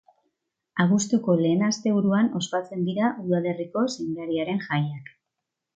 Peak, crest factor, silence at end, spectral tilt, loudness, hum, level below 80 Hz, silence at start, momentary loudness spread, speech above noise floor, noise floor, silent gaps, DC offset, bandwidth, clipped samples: -6 dBFS; 18 dB; 0.7 s; -6 dB/octave; -25 LUFS; none; -68 dBFS; 0.75 s; 7 LU; 60 dB; -84 dBFS; none; under 0.1%; 9 kHz; under 0.1%